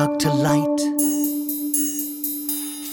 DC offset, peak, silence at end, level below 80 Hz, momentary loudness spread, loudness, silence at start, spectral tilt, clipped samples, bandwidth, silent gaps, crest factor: under 0.1%; -6 dBFS; 0 s; -58 dBFS; 6 LU; -21 LUFS; 0 s; -4.5 dB/octave; under 0.1%; 19.5 kHz; none; 16 dB